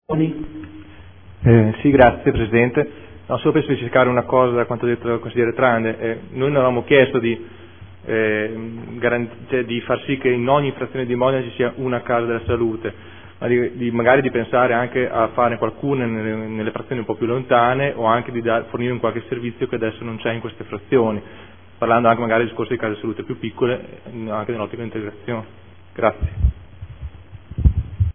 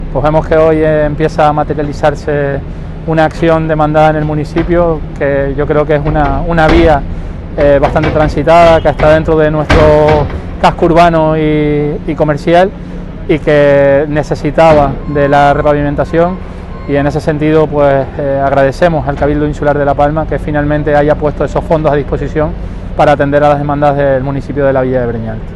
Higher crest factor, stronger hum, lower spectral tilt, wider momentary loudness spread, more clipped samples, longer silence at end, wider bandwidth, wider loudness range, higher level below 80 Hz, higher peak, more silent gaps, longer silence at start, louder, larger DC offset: first, 20 dB vs 10 dB; neither; first, -11 dB/octave vs -7.5 dB/octave; first, 13 LU vs 8 LU; second, under 0.1% vs 0.1%; about the same, 0.05 s vs 0 s; second, 3.6 kHz vs 11 kHz; first, 7 LU vs 3 LU; second, -34 dBFS vs -22 dBFS; about the same, 0 dBFS vs 0 dBFS; neither; about the same, 0.1 s vs 0 s; second, -19 LUFS vs -10 LUFS; first, 0.5% vs under 0.1%